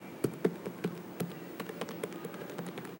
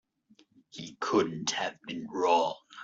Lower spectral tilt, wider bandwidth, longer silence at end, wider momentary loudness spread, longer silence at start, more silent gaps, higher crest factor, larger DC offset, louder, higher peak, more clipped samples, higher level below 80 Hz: first, -6 dB/octave vs -3.5 dB/octave; first, 17 kHz vs 7.8 kHz; about the same, 0 s vs 0 s; second, 8 LU vs 18 LU; second, 0 s vs 0.75 s; neither; about the same, 24 dB vs 20 dB; neither; second, -39 LUFS vs -30 LUFS; about the same, -14 dBFS vs -12 dBFS; neither; about the same, -76 dBFS vs -74 dBFS